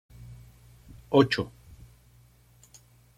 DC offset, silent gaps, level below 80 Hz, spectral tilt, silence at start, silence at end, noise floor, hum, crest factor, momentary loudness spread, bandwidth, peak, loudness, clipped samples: under 0.1%; none; -56 dBFS; -6.5 dB/octave; 0.3 s; 1.7 s; -58 dBFS; none; 26 dB; 26 LU; 15.5 kHz; -6 dBFS; -25 LUFS; under 0.1%